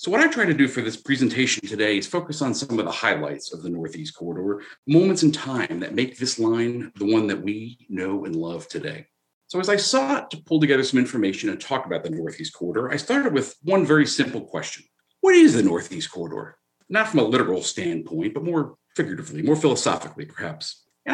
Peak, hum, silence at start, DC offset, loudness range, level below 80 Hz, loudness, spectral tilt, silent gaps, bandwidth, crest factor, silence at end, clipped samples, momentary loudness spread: -4 dBFS; none; 0 s; under 0.1%; 5 LU; -72 dBFS; -22 LUFS; -4.5 dB/octave; 4.78-4.83 s, 9.33-9.41 s; 10.5 kHz; 18 dB; 0 s; under 0.1%; 13 LU